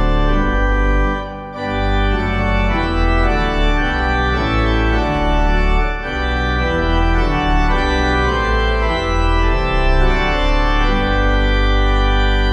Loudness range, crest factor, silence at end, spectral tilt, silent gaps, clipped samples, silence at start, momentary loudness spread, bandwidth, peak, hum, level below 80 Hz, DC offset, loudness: 1 LU; 12 dB; 0 s; -6.5 dB/octave; none; under 0.1%; 0 s; 3 LU; 7.4 kHz; -2 dBFS; none; -16 dBFS; under 0.1%; -17 LUFS